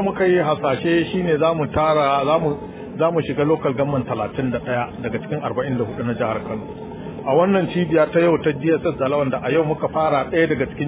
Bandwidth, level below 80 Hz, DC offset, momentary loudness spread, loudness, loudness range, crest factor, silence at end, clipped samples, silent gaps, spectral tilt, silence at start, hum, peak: 4 kHz; -46 dBFS; under 0.1%; 9 LU; -20 LUFS; 4 LU; 16 dB; 0 s; under 0.1%; none; -11 dB/octave; 0 s; none; -4 dBFS